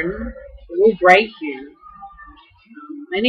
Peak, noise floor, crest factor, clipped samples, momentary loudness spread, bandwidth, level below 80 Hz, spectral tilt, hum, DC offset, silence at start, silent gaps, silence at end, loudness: 0 dBFS; -46 dBFS; 20 dB; under 0.1%; 24 LU; 9.2 kHz; -44 dBFS; -5 dB/octave; none; under 0.1%; 0 s; none; 0 s; -16 LUFS